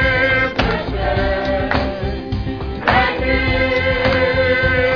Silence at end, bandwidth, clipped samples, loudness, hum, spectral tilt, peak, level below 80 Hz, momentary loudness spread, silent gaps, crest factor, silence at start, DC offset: 0 s; 5.4 kHz; under 0.1%; -17 LUFS; none; -7 dB/octave; 0 dBFS; -26 dBFS; 9 LU; none; 16 dB; 0 s; 0.3%